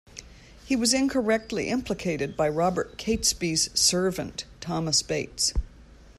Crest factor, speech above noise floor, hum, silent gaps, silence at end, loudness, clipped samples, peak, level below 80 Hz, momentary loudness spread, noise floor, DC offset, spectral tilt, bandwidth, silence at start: 20 dB; 22 dB; none; none; 0.05 s; -25 LUFS; under 0.1%; -8 dBFS; -42 dBFS; 12 LU; -48 dBFS; under 0.1%; -3 dB/octave; 14 kHz; 0.15 s